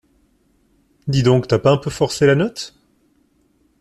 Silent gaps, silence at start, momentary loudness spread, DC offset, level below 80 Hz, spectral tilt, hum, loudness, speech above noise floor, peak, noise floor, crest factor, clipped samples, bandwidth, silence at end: none; 1.05 s; 16 LU; under 0.1%; -48 dBFS; -6 dB/octave; none; -17 LUFS; 44 dB; -2 dBFS; -60 dBFS; 18 dB; under 0.1%; 13 kHz; 1.1 s